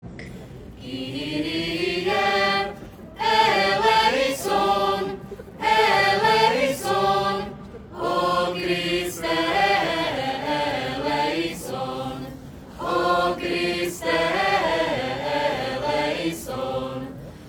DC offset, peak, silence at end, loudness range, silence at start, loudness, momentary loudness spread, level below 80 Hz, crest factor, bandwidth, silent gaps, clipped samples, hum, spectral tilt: under 0.1%; -6 dBFS; 0 s; 5 LU; 0.05 s; -22 LUFS; 17 LU; -50 dBFS; 18 dB; over 20 kHz; none; under 0.1%; none; -4 dB/octave